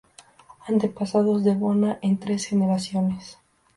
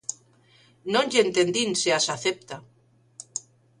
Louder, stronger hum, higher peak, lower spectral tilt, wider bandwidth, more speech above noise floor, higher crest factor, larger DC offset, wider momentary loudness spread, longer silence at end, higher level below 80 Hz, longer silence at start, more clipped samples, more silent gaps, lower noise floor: about the same, -23 LUFS vs -24 LUFS; neither; about the same, -8 dBFS vs -6 dBFS; first, -7 dB/octave vs -2.5 dB/octave; about the same, 11.5 kHz vs 11.5 kHz; second, 28 dB vs 34 dB; second, 14 dB vs 22 dB; neither; second, 5 LU vs 19 LU; about the same, 0.45 s vs 0.4 s; first, -62 dBFS vs -68 dBFS; first, 0.65 s vs 0.1 s; neither; neither; second, -51 dBFS vs -58 dBFS